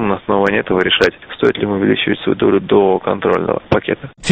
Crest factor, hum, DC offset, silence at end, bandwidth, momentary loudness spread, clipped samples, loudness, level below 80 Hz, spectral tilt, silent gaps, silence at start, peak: 14 dB; none; under 0.1%; 0 s; 8.6 kHz; 5 LU; under 0.1%; -15 LUFS; -44 dBFS; -5.5 dB/octave; none; 0 s; 0 dBFS